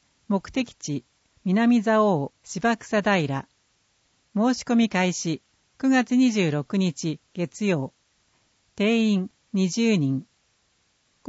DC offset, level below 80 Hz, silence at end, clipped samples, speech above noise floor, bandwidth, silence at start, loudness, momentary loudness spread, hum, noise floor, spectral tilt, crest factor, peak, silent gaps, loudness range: under 0.1%; -64 dBFS; 1.05 s; under 0.1%; 45 dB; 8 kHz; 0.3 s; -24 LUFS; 12 LU; none; -68 dBFS; -5.5 dB/octave; 16 dB; -8 dBFS; none; 3 LU